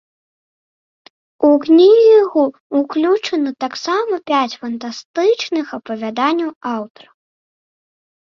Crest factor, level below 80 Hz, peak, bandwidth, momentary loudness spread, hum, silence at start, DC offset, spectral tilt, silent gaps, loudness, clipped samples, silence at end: 14 dB; -66 dBFS; -2 dBFS; 7.2 kHz; 15 LU; none; 1.4 s; under 0.1%; -4.5 dB/octave; 2.60-2.70 s, 5.05-5.14 s, 6.56-6.61 s; -15 LUFS; under 0.1%; 1.5 s